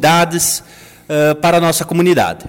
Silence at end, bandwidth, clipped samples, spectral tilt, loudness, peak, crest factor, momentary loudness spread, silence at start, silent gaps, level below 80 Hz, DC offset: 0 s; 17 kHz; under 0.1%; -4 dB/octave; -13 LUFS; 0 dBFS; 12 dB; 5 LU; 0 s; none; -48 dBFS; under 0.1%